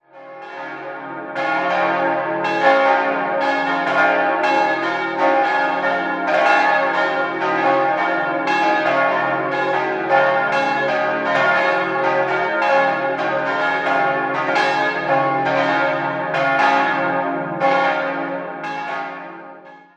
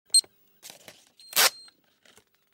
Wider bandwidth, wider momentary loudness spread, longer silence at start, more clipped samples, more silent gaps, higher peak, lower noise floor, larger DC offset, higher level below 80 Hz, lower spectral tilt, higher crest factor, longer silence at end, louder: second, 8.8 kHz vs 16.5 kHz; second, 10 LU vs 25 LU; about the same, 0.15 s vs 0.15 s; neither; neither; first, 0 dBFS vs -6 dBFS; second, -40 dBFS vs -61 dBFS; neither; first, -72 dBFS vs -84 dBFS; first, -5 dB/octave vs 3 dB/octave; second, 18 dB vs 24 dB; second, 0.15 s vs 1.05 s; first, -18 LUFS vs -22 LUFS